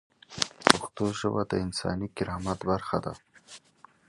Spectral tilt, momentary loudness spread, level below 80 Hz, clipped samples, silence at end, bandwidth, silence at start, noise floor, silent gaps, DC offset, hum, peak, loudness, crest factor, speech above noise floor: -4 dB/octave; 25 LU; -52 dBFS; under 0.1%; 0.5 s; 12.5 kHz; 0.3 s; -58 dBFS; none; under 0.1%; none; 0 dBFS; -28 LUFS; 30 dB; 28 dB